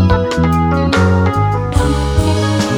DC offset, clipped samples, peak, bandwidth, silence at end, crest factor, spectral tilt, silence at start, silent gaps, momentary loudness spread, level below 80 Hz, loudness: under 0.1%; under 0.1%; 0 dBFS; 13 kHz; 0 s; 12 dB; -6.5 dB/octave; 0 s; none; 3 LU; -22 dBFS; -14 LUFS